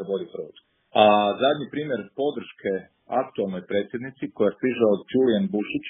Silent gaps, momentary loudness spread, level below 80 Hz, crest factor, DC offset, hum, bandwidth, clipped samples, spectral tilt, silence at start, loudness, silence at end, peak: none; 14 LU; -68 dBFS; 22 dB; under 0.1%; none; 3.9 kHz; under 0.1%; -4 dB/octave; 0 s; -24 LUFS; 0 s; -2 dBFS